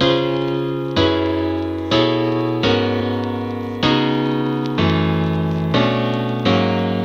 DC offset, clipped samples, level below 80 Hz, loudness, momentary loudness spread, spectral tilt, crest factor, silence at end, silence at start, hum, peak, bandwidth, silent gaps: under 0.1%; under 0.1%; -44 dBFS; -18 LUFS; 5 LU; -7 dB/octave; 14 dB; 0 s; 0 s; none; -4 dBFS; 7.6 kHz; none